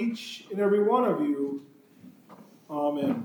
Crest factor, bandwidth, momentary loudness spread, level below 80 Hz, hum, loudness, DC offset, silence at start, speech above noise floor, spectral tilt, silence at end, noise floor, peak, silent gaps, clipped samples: 16 dB; over 20 kHz; 15 LU; -86 dBFS; none; -27 LUFS; under 0.1%; 0 s; 26 dB; -6.5 dB/octave; 0 s; -53 dBFS; -12 dBFS; none; under 0.1%